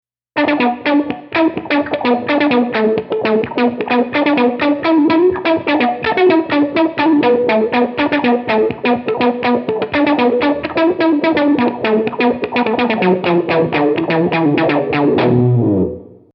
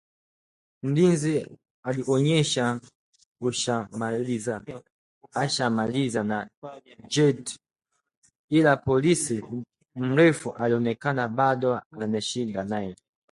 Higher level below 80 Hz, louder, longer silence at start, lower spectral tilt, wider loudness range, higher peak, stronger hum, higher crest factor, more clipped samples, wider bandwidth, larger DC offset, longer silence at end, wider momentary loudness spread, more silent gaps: first, -52 dBFS vs -62 dBFS; first, -14 LUFS vs -25 LUFS; second, 0.35 s vs 0.85 s; first, -9 dB/octave vs -5 dB/octave; second, 2 LU vs 5 LU; first, -2 dBFS vs -6 dBFS; neither; second, 12 dB vs 20 dB; neither; second, 5.8 kHz vs 11.5 kHz; neither; second, 0.2 s vs 0.4 s; second, 4 LU vs 16 LU; second, none vs 1.70-1.83 s, 2.95-3.13 s, 3.26-3.35 s, 4.92-5.21 s, 6.57-6.62 s, 8.17-8.22 s, 8.39-8.48 s, 11.86-11.90 s